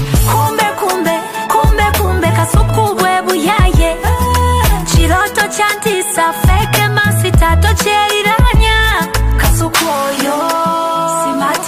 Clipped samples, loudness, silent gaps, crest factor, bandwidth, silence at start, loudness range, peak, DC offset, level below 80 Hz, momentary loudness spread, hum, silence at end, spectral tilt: under 0.1%; -12 LUFS; none; 12 dB; 15.5 kHz; 0 s; 1 LU; 0 dBFS; under 0.1%; -18 dBFS; 4 LU; none; 0 s; -4.5 dB/octave